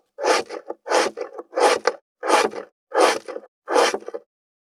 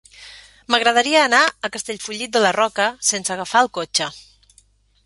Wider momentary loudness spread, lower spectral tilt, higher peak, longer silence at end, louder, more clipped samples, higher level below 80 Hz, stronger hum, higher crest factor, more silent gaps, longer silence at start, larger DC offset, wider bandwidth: first, 18 LU vs 12 LU; about the same, -1 dB/octave vs -1 dB/octave; about the same, -2 dBFS vs -2 dBFS; second, 0.5 s vs 0.85 s; second, -21 LUFS vs -18 LUFS; neither; second, -78 dBFS vs -60 dBFS; neither; about the same, 20 dB vs 18 dB; first, 2.02-2.15 s, 2.72-2.87 s, 3.48-3.62 s vs none; about the same, 0.2 s vs 0.2 s; neither; first, 15.5 kHz vs 11.5 kHz